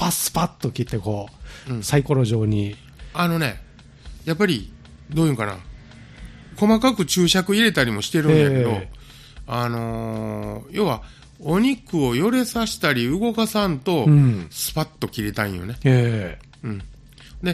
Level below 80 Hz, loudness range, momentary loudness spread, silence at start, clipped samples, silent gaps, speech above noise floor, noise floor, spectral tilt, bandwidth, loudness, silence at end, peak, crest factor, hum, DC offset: -44 dBFS; 6 LU; 15 LU; 0 s; under 0.1%; none; 22 dB; -42 dBFS; -5.5 dB/octave; 15.5 kHz; -21 LUFS; 0 s; -2 dBFS; 18 dB; none; under 0.1%